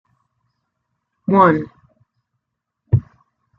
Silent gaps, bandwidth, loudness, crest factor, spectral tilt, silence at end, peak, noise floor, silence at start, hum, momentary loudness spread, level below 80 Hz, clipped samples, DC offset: none; 5.2 kHz; -17 LUFS; 20 dB; -10.5 dB/octave; 0.55 s; -2 dBFS; -79 dBFS; 1.3 s; none; 16 LU; -46 dBFS; under 0.1%; under 0.1%